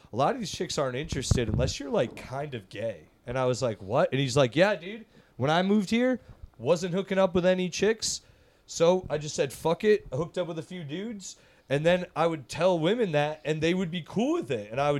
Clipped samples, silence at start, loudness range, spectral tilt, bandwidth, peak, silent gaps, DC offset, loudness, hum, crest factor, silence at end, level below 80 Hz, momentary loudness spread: under 0.1%; 0.15 s; 3 LU; -5 dB/octave; 14 kHz; -8 dBFS; none; under 0.1%; -28 LUFS; none; 18 dB; 0 s; -48 dBFS; 11 LU